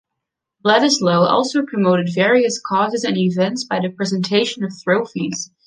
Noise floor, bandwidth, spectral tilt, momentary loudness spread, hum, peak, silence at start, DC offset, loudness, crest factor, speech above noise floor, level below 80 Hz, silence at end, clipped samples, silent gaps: -80 dBFS; 9.8 kHz; -4.5 dB/octave; 8 LU; none; -2 dBFS; 0.65 s; under 0.1%; -17 LUFS; 16 dB; 63 dB; -64 dBFS; 0.2 s; under 0.1%; none